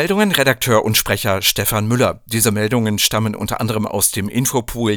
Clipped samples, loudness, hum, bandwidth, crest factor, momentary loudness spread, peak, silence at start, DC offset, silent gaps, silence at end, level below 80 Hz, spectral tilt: under 0.1%; -16 LUFS; none; over 20 kHz; 16 dB; 6 LU; 0 dBFS; 0 s; under 0.1%; none; 0 s; -40 dBFS; -3.5 dB/octave